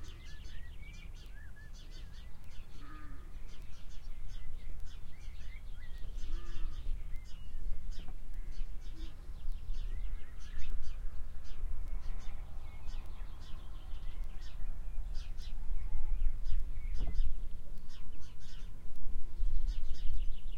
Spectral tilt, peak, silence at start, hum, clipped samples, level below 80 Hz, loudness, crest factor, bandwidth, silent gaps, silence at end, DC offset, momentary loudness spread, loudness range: -5.5 dB/octave; -14 dBFS; 0 s; none; under 0.1%; -38 dBFS; -47 LUFS; 14 dB; 5.2 kHz; none; 0 s; under 0.1%; 11 LU; 9 LU